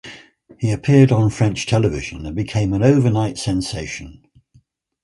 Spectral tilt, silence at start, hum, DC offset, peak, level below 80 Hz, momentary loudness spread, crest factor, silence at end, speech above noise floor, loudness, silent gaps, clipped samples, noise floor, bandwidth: -6.5 dB/octave; 0.05 s; none; under 0.1%; 0 dBFS; -40 dBFS; 14 LU; 18 dB; 0.9 s; 39 dB; -18 LUFS; none; under 0.1%; -56 dBFS; 11.5 kHz